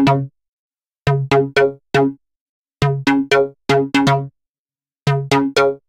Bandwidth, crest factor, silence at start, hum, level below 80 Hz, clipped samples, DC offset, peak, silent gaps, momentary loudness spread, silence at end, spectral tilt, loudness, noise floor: 13.5 kHz; 18 dB; 0 s; none; -46 dBFS; under 0.1%; under 0.1%; 0 dBFS; 0.48-0.71 s, 0.87-0.91 s, 0.98-1.05 s, 2.41-2.65 s, 4.49-4.65 s, 5.02-5.06 s; 7 LU; 0.15 s; -6 dB/octave; -17 LUFS; under -90 dBFS